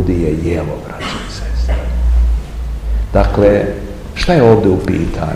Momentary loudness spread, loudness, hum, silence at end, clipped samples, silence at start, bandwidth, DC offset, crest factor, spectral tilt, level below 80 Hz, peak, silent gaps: 13 LU; -15 LUFS; none; 0 s; 0.3%; 0 s; 11 kHz; 0.6%; 14 dB; -7.5 dB/octave; -18 dBFS; 0 dBFS; none